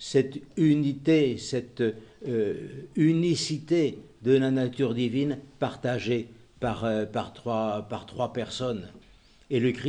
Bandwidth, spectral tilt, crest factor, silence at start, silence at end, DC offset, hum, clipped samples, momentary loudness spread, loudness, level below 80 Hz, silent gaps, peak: 10 kHz; -6.5 dB/octave; 18 dB; 0 s; 0 s; under 0.1%; none; under 0.1%; 10 LU; -28 LUFS; -60 dBFS; none; -10 dBFS